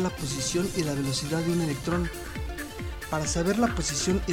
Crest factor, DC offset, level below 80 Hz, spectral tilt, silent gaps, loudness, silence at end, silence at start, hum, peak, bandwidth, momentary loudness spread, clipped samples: 16 dB; under 0.1%; -40 dBFS; -4.5 dB/octave; none; -28 LUFS; 0 s; 0 s; none; -12 dBFS; 19 kHz; 10 LU; under 0.1%